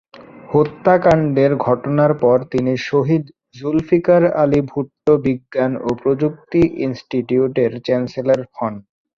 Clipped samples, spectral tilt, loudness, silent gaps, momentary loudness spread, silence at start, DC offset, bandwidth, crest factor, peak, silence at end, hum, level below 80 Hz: under 0.1%; -8.5 dB/octave; -17 LUFS; none; 9 LU; 0.2 s; under 0.1%; 7.4 kHz; 16 dB; 0 dBFS; 0.4 s; none; -48 dBFS